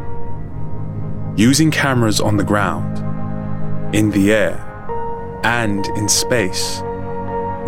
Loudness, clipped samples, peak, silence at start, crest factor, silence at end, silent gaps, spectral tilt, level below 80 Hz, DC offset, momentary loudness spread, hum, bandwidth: -18 LUFS; under 0.1%; -2 dBFS; 0 s; 16 dB; 0 s; none; -4.5 dB/octave; -36 dBFS; under 0.1%; 14 LU; none; 16.5 kHz